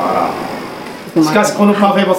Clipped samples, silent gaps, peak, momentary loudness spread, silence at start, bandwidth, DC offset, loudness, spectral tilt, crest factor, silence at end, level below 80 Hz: under 0.1%; none; 0 dBFS; 14 LU; 0 s; 16.5 kHz; under 0.1%; -13 LUFS; -5.5 dB/octave; 14 dB; 0 s; -54 dBFS